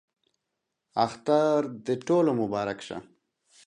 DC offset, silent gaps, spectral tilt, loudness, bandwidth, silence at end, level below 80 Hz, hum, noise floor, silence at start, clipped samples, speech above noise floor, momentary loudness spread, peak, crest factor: under 0.1%; none; -6.5 dB/octave; -27 LUFS; 10.5 kHz; 0.65 s; -68 dBFS; none; -83 dBFS; 0.95 s; under 0.1%; 57 dB; 13 LU; -8 dBFS; 20 dB